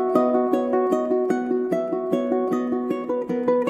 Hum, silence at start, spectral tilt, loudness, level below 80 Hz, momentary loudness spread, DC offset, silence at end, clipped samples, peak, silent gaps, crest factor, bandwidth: none; 0 s; -7.5 dB/octave; -23 LUFS; -66 dBFS; 5 LU; under 0.1%; 0 s; under 0.1%; -6 dBFS; none; 16 dB; 13.5 kHz